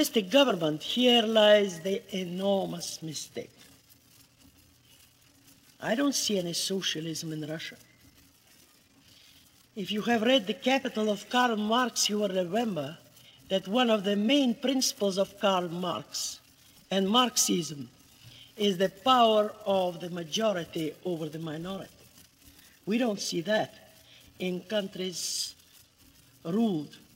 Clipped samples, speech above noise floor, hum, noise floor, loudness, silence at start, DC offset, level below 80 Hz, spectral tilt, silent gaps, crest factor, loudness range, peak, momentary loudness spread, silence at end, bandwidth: under 0.1%; 32 dB; none; -60 dBFS; -28 LUFS; 0 s; under 0.1%; -72 dBFS; -3.5 dB/octave; none; 20 dB; 8 LU; -10 dBFS; 15 LU; 0.2 s; 16 kHz